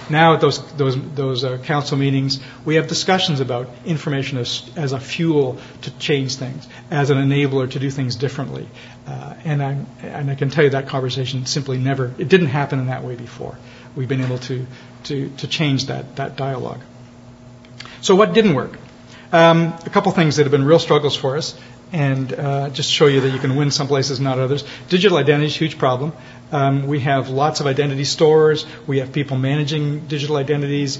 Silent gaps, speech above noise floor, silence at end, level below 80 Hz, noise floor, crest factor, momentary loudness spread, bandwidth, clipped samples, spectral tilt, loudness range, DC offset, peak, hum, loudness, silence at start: none; 23 dB; 0 s; -54 dBFS; -41 dBFS; 18 dB; 15 LU; 8 kHz; under 0.1%; -5.5 dB/octave; 7 LU; under 0.1%; 0 dBFS; none; -18 LUFS; 0 s